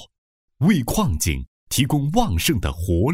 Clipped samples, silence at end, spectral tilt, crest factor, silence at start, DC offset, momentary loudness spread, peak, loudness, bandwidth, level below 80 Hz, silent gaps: under 0.1%; 0 s; -5 dB/octave; 18 dB; 0 s; under 0.1%; 5 LU; -4 dBFS; -21 LUFS; 16.5 kHz; -32 dBFS; 0.18-0.48 s, 1.48-1.67 s